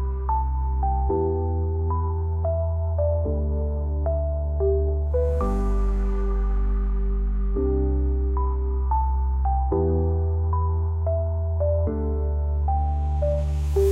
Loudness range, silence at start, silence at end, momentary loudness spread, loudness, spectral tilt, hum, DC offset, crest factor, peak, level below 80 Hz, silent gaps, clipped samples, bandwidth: 1 LU; 0 s; 0 s; 3 LU; -25 LUFS; -10 dB/octave; none; 0.1%; 12 dB; -12 dBFS; -24 dBFS; none; under 0.1%; 2.7 kHz